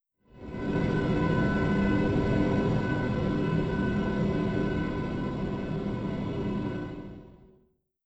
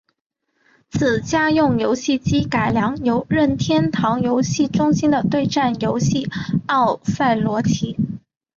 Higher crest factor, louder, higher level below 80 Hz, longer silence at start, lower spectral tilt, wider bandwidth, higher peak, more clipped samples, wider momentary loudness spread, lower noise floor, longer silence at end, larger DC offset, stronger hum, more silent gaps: about the same, 16 dB vs 12 dB; second, -29 LUFS vs -19 LUFS; about the same, -42 dBFS vs -44 dBFS; second, 0.35 s vs 0.95 s; first, -8.5 dB/octave vs -6 dB/octave; about the same, 8.2 kHz vs 7.6 kHz; second, -14 dBFS vs -6 dBFS; neither; first, 10 LU vs 5 LU; first, -67 dBFS vs -60 dBFS; first, 0.7 s vs 0.4 s; neither; neither; neither